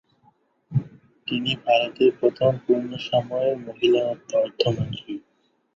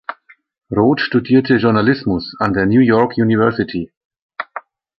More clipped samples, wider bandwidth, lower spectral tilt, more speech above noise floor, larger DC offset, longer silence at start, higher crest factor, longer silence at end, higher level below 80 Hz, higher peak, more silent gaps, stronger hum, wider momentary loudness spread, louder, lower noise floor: neither; first, 7.6 kHz vs 5.8 kHz; second, -6.5 dB/octave vs -9.5 dB/octave; first, 45 dB vs 21 dB; neither; first, 0.7 s vs 0.1 s; about the same, 18 dB vs 14 dB; first, 0.55 s vs 0.4 s; second, -58 dBFS vs -46 dBFS; second, -6 dBFS vs -2 dBFS; second, none vs 3.97-4.10 s, 4.22-4.29 s; neither; second, 10 LU vs 17 LU; second, -23 LUFS vs -15 LUFS; first, -67 dBFS vs -35 dBFS